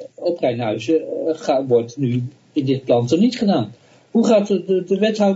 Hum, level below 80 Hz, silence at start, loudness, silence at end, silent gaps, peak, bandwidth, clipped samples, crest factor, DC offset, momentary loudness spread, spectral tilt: none; -64 dBFS; 0 s; -19 LUFS; 0 s; none; -4 dBFS; 8 kHz; under 0.1%; 16 dB; under 0.1%; 8 LU; -7 dB/octave